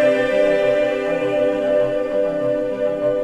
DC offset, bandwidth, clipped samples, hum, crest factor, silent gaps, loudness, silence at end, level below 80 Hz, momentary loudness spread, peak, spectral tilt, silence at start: under 0.1%; 10 kHz; under 0.1%; none; 12 dB; none; -19 LUFS; 0 s; -50 dBFS; 4 LU; -6 dBFS; -6 dB/octave; 0 s